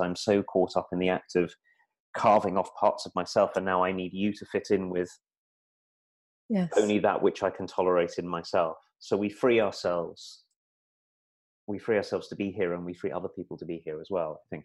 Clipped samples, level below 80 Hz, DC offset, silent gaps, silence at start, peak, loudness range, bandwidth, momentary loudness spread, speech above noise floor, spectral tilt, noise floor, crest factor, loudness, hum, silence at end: under 0.1%; -66 dBFS; under 0.1%; 2.00-2.13 s, 5.37-6.49 s, 10.56-11.67 s; 0 s; -10 dBFS; 6 LU; 12 kHz; 13 LU; over 62 dB; -6 dB/octave; under -90 dBFS; 20 dB; -29 LUFS; none; 0.05 s